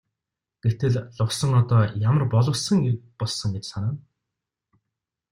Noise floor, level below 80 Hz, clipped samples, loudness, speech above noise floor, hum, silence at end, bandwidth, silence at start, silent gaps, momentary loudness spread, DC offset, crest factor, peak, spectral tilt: -86 dBFS; -54 dBFS; under 0.1%; -23 LUFS; 64 dB; none; 1.35 s; 12 kHz; 0.65 s; none; 9 LU; under 0.1%; 16 dB; -8 dBFS; -6 dB/octave